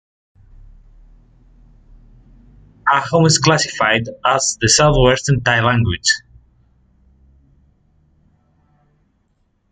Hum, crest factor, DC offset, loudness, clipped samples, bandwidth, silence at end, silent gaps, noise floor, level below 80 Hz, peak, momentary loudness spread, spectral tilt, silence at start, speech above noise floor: none; 18 dB; under 0.1%; -15 LUFS; under 0.1%; 9.6 kHz; 3.55 s; none; -63 dBFS; -36 dBFS; -2 dBFS; 5 LU; -3.5 dB/octave; 2.85 s; 48 dB